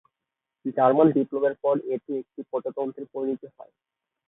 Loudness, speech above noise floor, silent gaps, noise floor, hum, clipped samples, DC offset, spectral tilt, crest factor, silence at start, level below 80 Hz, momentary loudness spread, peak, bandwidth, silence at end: -25 LUFS; 61 dB; none; -86 dBFS; none; under 0.1%; under 0.1%; -12 dB/octave; 20 dB; 0.65 s; -74 dBFS; 14 LU; -6 dBFS; 4 kHz; 0.65 s